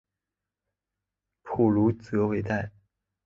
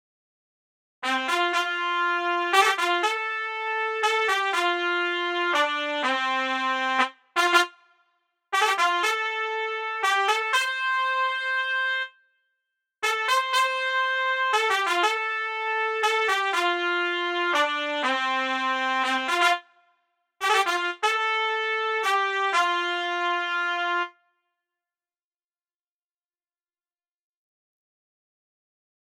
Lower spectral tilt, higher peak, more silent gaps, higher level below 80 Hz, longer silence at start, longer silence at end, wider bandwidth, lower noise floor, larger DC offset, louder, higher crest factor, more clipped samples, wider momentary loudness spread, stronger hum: first, -9.5 dB/octave vs 0.5 dB/octave; second, -10 dBFS vs -4 dBFS; neither; first, -54 dBFS vs -80 dBFS; first, 1.45 s vs 1 s; second, 0.55 s vs 4.95 s; second, 7.2 kHz vs 16 kHz; about the same, -88 dBFS vs under -90 dBFS; neither; about the same, -26 LUFS vs -24 LUFS; about the same, 20 dB vs 22 dB; neither; first, 11 LU vs 5 LU; neither